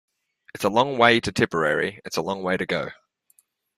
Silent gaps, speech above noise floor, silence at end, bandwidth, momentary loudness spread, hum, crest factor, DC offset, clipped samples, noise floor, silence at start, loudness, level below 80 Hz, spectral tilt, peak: none; 41 dB; 0.85 s; 15 kHz; 11 LU; none; 22 dB; under 0.1%; under 0.1%; -64 dBFS; 0.55 s; -22 LUFS; -58 dBFS; -4.5 dB/octave; -2 dBFS